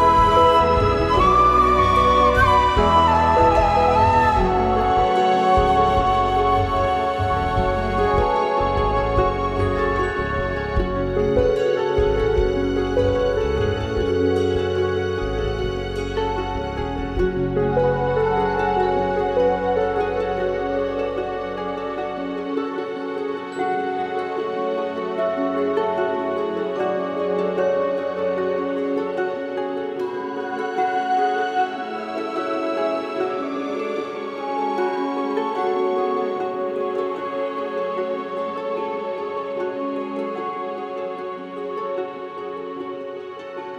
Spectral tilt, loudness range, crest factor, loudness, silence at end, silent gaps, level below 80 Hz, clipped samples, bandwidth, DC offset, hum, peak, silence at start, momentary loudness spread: -6.5 dB/octave; 10 LU; 16 dB; -21 LUFS; 0 s; none; -34 dBFS; under 0.1%; 12.5 kHz; under 0.1%; none; -4 dBFS; 0 s; 11 LU